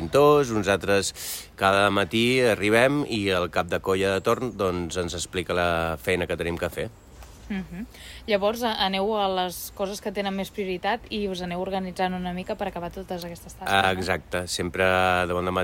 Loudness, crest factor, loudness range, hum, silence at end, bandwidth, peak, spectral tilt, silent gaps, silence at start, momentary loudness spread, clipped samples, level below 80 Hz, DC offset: -25 LUFS; 20 dB; 7 LU; none; 0 s; 16.5 kHz; -6 dBFS; -4.5 dB/octave; none; 0 s; 13 LU; under 0.1%; -48 dBFS; under 0.1%